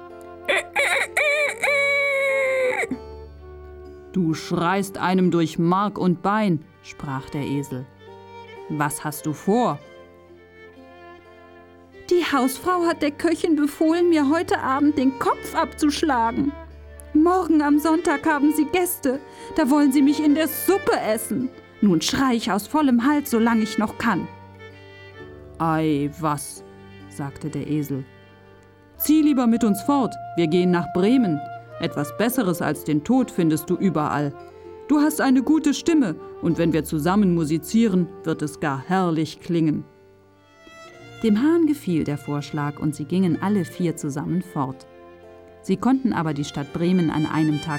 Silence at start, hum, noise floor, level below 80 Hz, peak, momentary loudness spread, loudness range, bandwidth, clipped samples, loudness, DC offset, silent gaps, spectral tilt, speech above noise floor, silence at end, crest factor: 0 s; none; -53 dBFS; -52 dBFS; -6 dBFS; 15 LU; 6 LU; 17.5 kHz; under 0.1%; -22 LUFS; under 0.1%; none; -5.5 dB/octave; 32 dB; 0 s; 16 dB